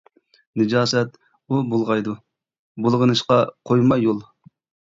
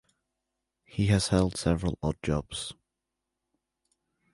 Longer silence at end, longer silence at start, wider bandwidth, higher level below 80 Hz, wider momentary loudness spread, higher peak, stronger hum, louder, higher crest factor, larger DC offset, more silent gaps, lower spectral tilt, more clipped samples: second, 0.65 s vs 1.6 s; second, 0.55 s vs 0.95 s; second, 7.8 kHz vs 11.5 kHz; second, -60 dBFS vs -44 dBFS; about the same, 12 LU vs 13 LU; first, -4 dBFS vs -10 dBFS; neither; first, -20 LUFS vs -28 LUFS; about the same, 16 dB vs 20 dB; neither; first, 2.59-2.75 s vs none; about the same, -6 dB/octave vs -5.5 dB/octave; neither